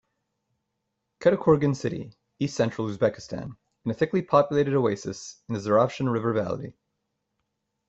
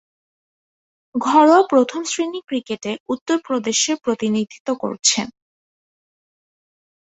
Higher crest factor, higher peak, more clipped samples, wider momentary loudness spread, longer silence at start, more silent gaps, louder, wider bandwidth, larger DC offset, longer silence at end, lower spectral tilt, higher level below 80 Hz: about the same, 20 dB vs 20 dB; second, -6 dBFS vs 0 dBFS; neither; about the same, 15 LU vs 13 LU; about the same, 1.2 s vs 1.15 s; second, none vs 3.00-3.06 s, 3.21-3.26 s, 4.60-4.65 s; second, -25 LUFS vs -19 LUFS; about the same, 8.2 kHz vs 8.4 kHz; neither; second, 1.15 s vs 1.75 s; first, -7 dB/octave vs -2.5 dB/octave; first, -60 dBFS vs -66 dBFS